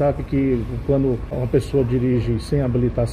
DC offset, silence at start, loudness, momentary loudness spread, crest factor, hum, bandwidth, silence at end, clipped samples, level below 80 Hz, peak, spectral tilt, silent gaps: under 0.1%; 0 s; -21 LUFS; 3 LU; 12 dB; none; 11.5 kHz; 0 s; under 0.1%; -32 dBFS; -6 dBFS; -9 dB/octave; none